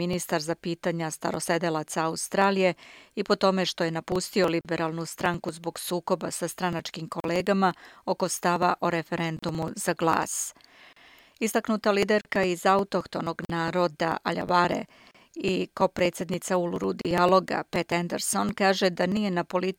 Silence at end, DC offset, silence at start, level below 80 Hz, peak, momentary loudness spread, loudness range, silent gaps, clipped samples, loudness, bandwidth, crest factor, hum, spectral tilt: 0.05 s; under 0.1%; 0 s; -60 dBFS; -8 dBFS; 9 LU; 3 LU; none; under 0.1%; -27 LUFS; 17 kHz; 20 dB; none; -4.5 dB/octave